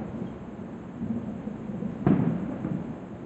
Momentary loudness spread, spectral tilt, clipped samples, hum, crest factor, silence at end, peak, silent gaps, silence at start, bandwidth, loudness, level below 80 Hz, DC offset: 15 LU; -10 dB/octave; under 0.1%; none; 22 dB; 0 s; -8 dBFS; none; 0 s; 8 kHz; -31 LUFS; -54 dBFS; under 0.1%